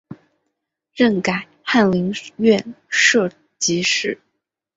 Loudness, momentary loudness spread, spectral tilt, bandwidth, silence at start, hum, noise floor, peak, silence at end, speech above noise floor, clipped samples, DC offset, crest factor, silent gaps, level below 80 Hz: -18 LUFS; 11 LU; -3.5 dB/octave; 8 kHz; 0.1 s; none; -76 dBFS; -2 dBFS; 0.6 s; 58 dB; under 0.1%; under 0.1%; 18 dB; none; -60 dBFS